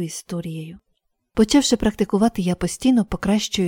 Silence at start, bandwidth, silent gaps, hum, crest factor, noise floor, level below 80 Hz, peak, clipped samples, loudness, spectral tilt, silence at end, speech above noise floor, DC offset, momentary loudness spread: 0 s; 17 kHz; none; none; 18 dB; -71 dBFS; -42 dBFS; -4 dBFS; under 0.1%; -20 LUFS; -5 dB/octave; 0 s; 51 dB; under 0.1%; 13 LU